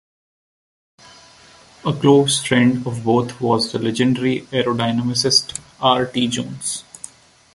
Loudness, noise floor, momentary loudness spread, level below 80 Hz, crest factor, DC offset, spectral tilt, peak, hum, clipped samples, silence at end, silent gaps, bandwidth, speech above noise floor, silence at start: -18 LUFS; -47 dBFS; 12 LU; -56 dBFS; 18 dB; under 0.1%; -4.5 dB/octave; -2 dBFS; none; under 0.1%; 0.75 s; none; 11.5 kHz; 29 dB; 1.85 s